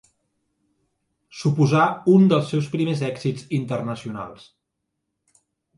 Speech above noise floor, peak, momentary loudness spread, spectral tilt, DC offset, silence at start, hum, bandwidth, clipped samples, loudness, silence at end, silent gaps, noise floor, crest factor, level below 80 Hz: 59 dB; -4 dBFS; 15 LU; -7.5 dB/octave; under 0.1%; 1.35 s; none; 11 kHz; under 0.1%; -21 LUFS; 1.45 s; none; -79 dBFS; 18 dB; -64 dBFS